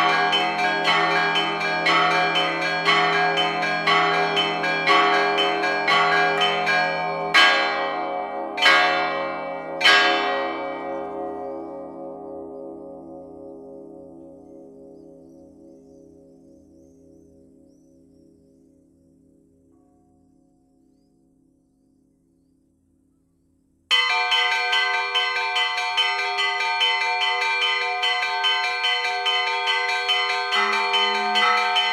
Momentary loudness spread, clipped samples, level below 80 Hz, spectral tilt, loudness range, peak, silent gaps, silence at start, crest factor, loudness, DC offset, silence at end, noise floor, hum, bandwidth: 18 LU; under 0.1%; -66 dBFS; -2 dB/octave; 15 LU; -2 dBFS; none; 0 s; 22 dB; -20 LUFS; under 0.1%; 0 s; -64 dBFS; none; 14.5 kHz